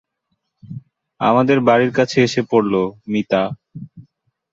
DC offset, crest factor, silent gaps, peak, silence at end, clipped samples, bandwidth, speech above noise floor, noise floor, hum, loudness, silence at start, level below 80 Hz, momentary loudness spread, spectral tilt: under 0.1%; 18 dB; none; -2 dBFS; 0.5 s; under 0.1%; 7.8 kHz; 57 dB; -73 dBFS; none; -17 LUFS; 0.65 s; -58 dBFS; 22 LU; -6 dB/octave